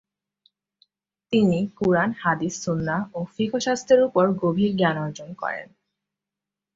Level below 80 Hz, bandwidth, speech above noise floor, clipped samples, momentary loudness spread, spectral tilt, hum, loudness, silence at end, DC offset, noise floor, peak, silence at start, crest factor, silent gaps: -60 dBFS; 7.8 kHz; 65 dB; under 0.1%; 11 LU; -6 dB/octave; 50 Hz at -50 dBFS; -23 LUFS; 1.1 s; under 0.1%; -88 dBFS; -6 dBFS; 1.3 s; 18 dB; none